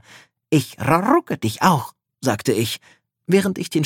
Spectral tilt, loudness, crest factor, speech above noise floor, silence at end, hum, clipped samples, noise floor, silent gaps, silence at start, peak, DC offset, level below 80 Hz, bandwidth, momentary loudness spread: -5.5 dB/octave; -20 LUFS; 20 dB; 30 dB; 0 s; none; under 0.1%; -49 dBFS; none; 0.15 s; -2 dBFS; under 0.1%; -60 dBFS; 17.5 kHz; 9 LU